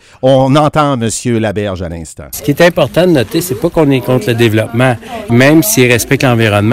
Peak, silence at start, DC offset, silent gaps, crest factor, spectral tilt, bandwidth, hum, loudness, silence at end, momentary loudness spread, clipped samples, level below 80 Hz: 0 dBFS; 0.25 s; under 0.1%; none; 10 dB; -5.5 dB/octave; 16.5 kHz; none; -10 LUFS; 0 s; 11 LU; 0.6%; -38 dBFS